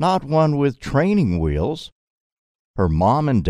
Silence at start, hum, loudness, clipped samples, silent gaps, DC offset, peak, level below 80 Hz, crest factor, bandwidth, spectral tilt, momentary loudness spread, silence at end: 0 s; none; -19 LUFS; under 0.1%; 1.92-2.74 s; under 0.1%; -4 dBFS; -34 dBFS; 16 dB; 10.5 kHz; -8 dB/octave; 12 LU; 0 s